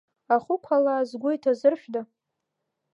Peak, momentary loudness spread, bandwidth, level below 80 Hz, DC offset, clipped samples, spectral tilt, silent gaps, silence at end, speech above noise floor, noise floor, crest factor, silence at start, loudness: -8 dBFS; 10 LU; 7.6 kHz; -82 dBFS; under 0.1%; under 0.1%; -6 dB/octave; none; 0.9 s; 58 dB; -82 dBFS; 18 dB; 0.3 s; -25 LUFS